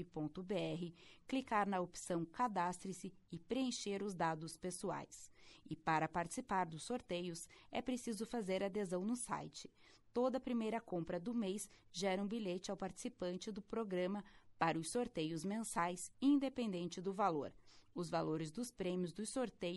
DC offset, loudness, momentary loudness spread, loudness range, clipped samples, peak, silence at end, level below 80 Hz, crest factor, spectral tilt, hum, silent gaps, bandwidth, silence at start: under 0.1%; -42 LUFS; 10 LU; 3 LU; under 0.1%; -22 dBFS; 0 s; -70 dBFS; 20 dB; -5 dB/octave; none; none; 11.5 kHz; 0 s